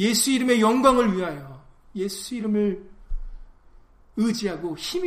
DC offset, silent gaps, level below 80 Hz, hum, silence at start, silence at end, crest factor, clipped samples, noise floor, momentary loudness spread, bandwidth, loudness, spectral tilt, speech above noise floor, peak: under 0.1%; none; -40 dBFS; none; 0 s; 0 s; 20 dB; under 0.1%; -51 dBFS; 22 LU; 15.5 kHz; -23 LUFS; -4 dB/octave; 29 dB; -4 dBFS